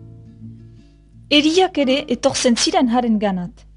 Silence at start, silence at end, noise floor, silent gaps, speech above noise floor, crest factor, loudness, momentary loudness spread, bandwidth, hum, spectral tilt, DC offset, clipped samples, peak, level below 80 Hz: 0 s; 0.25 s; -45 dBFS; none; 29 dB; 18 dB; -17 LUFS; 5 LU; 11 kHz; none; -3.5 dB/octave; under 0.1%; under 0.1%; 0 dBFS; -48 dBFS